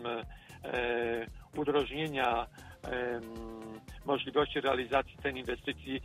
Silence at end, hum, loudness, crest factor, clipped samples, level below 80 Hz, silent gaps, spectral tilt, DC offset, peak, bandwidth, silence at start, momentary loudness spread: 0 s; none; -34 LUFS; 20 dB; under 0.1%; -54 dBFS; none; -5.5 dB/octave; under 0.1%; -14 dBFS; 15 kHz; 0 s; 14 LU